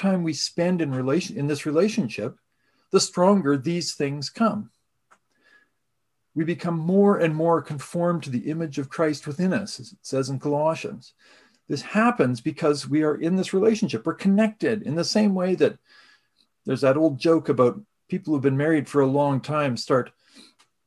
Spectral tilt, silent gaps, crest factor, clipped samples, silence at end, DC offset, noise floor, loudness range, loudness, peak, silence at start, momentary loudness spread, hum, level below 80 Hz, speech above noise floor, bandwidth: -6 dB/octave; none; 18 dB; under 0.1%; 0.45 s; under 0.1%; -79 dBFS; 4 LU; -23 LUFS; -4 dBFS; 0 s; 11 LU; none; -68 dBFS; 56 dB; 12.5 kHz